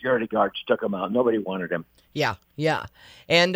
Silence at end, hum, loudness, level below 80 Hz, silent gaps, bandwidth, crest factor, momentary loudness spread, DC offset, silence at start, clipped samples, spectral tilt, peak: 0 s; none; -25 LUFS; -60 dBFS; none; 16 kHz; 20 dB; 8 LU; under 0.1%; 0 s; under 0.1%; -5 dB/octave; -4 dBFS